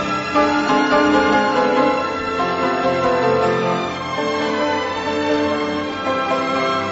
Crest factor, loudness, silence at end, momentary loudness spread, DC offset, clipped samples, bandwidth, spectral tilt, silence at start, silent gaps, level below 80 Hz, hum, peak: 14 dB; -18 LUFS; 0 s; 6 LU; under 0.1%; under 0.1%; 8 kHz; -5 dB/octave; 0 s; none; -48 dBFS; none; -4 dBFS